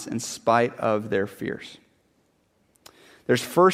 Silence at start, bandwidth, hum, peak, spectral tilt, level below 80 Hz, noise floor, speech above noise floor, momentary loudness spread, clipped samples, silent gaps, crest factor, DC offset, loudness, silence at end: 0 s; 16 kHz; none; -6 dBFS; -5 dB/octave; -66 dBFS; -66 dBFS; 43 dB; 15 LU; under 0.1%; none; 20 dB; under 0.1%; -24 LUFS; 0 s